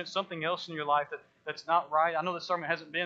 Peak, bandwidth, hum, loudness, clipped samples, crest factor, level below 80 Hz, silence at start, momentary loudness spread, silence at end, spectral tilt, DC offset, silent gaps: -14 dBFS; 8 kHz; none; -31 LUFS; under 0.1%; 18 dB; -84 dBFS; 0 s; 12 LU; 0 s; -4.5 dB/octave; under 0.1%; none